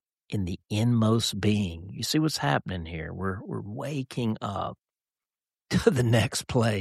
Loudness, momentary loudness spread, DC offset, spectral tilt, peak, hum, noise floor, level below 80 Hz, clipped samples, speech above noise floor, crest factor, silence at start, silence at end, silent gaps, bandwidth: -28 LUFS; 11 LU; under 0.1%; -5.5 dB/octave; -6 dBFS; none; under -90 dBFS; -52 dBFS; under 0.1%; over 63 dB; 22 dB; 0.3 s; 0 s; none; 14 kHz